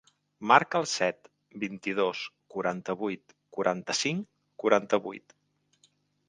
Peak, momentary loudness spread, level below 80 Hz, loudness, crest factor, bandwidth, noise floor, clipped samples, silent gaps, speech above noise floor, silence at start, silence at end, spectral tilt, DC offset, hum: -4 dBFS; 19 LU; -74 dBFS; -29 LUFS; 26 dB; 10 kHz; -69 dBFS; under 0.1%; none; 40 dB; 0.4 s; 1.1 s; -3.5 dB/octave; under 0.1%; none